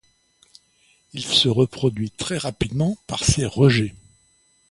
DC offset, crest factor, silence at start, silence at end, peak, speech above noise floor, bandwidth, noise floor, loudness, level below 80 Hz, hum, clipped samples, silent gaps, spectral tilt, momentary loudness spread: under 0.1%; 20 dB; 1.15 s; 0.75 s; -4 dBFS; 40 dB; 11.5 kHz; -61 dBFS; -21 LUFS; -42 dBFS; none; under 0.1%; none; -4.5 dB/octave; 10 LU